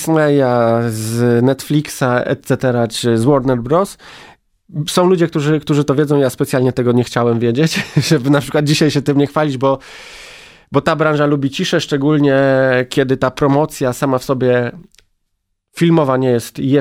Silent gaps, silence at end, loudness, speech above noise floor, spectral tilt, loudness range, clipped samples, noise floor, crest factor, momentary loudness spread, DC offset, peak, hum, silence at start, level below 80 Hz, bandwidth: none; 0 s; -15 LUFS; 55 dB; -6 dB/octave; 2 LU; under 0.1%; -69 dBFS; 14 dB; 5 LU; under 0.1%; 0 dBFS; none; 0 s; -48 dBFS; 16 kHz